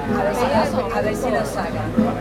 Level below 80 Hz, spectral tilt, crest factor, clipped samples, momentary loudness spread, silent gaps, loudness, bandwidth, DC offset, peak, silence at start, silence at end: -38 dBFS; -6 dB/octave; 16 dB; under 0.1%; 4 LU; none; -21 LUFS; 16.5 kHz; under 0.1%; -4 dBFS; 0 s; 0 s